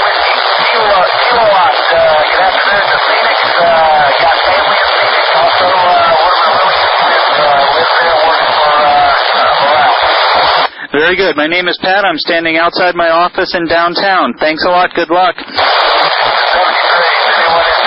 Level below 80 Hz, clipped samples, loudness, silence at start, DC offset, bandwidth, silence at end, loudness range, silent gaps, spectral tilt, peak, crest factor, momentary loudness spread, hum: -44 dBFS; under 0.1%; -9 LUFS; 0 s; under 0.1%; 5.8 kHz; 0 s; 2 LU; none; -6 dB/octave; 0 dBFS; 10 dB; 3 LU; none